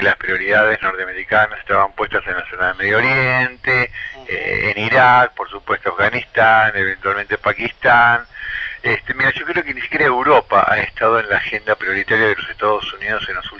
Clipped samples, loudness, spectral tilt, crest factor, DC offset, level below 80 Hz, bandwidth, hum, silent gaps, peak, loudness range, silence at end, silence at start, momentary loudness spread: under 0.1%; -16 LUFS; -6 dB/octave; 16 dB; under 0.1%; -46 dBFS; 7.4 kHz; none; none; 0 dBFS; 2 LU; 0 s; 0 s; 9 LU